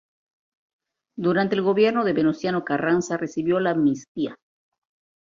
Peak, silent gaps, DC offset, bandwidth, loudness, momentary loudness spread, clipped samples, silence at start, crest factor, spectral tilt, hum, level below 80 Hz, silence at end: -8 dBFS; 4.08-4.15 s; under 0.1%; 7.6 kHz; -23 LUFS; 10 LU; under 0.1%; 1.15 s; 16 dB; -6 dB/octave; none; -64 dBFS; 0.85 s